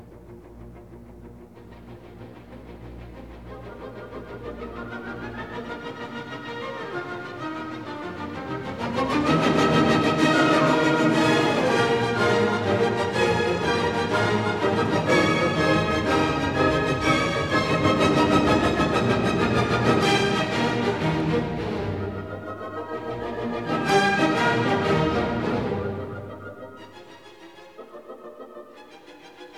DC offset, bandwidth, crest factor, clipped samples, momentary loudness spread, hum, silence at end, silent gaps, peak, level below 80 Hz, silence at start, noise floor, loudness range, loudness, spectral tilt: 0.2%; 14 kHz; 18 dB; under 0.1%; 22 LU; none; 0 s; none; -6 dBFS; -46 dBFS; 0 s; -46 dBFS; 18 LU; -23 LUFS; -5.5 dB/octave